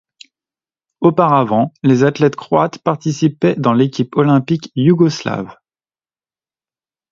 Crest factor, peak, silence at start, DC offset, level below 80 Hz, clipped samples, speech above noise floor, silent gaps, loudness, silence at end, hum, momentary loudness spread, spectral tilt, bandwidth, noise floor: 16 dB; 0 dBFS; 1 s; under 0.1%; -58 dBFS; under 0.1%; over 76 dB; none; -15 LUFS; 1.6 s; none; 7 LU; -7.5 dB/octave; 7.6 kHz; under -90 dBFS